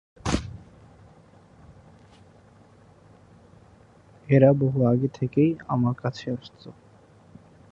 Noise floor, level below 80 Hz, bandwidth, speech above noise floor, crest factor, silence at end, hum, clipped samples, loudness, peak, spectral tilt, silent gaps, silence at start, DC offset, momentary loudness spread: -54 dBFS; -48 dBFS; 10.5 kHz; 31 dB; 24 dB; 1 s; none; under 0.1%; -23 LUFS; -4 dBFS; -8 dB/octave; none; 0.25 s; under 0.1%; 26 LU